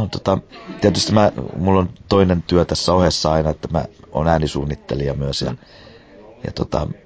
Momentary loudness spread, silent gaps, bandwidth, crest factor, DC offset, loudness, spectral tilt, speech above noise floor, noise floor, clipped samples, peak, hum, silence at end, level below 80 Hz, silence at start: 11 LU; none; 8 kHz; 18 dB; under 0.1%; -19 LUFS; -6 dB/octave; 25 dB; -43 dBFS; under 0.1%; -2 dBFS; none; 0.15 s; -32 dBFS; 0 s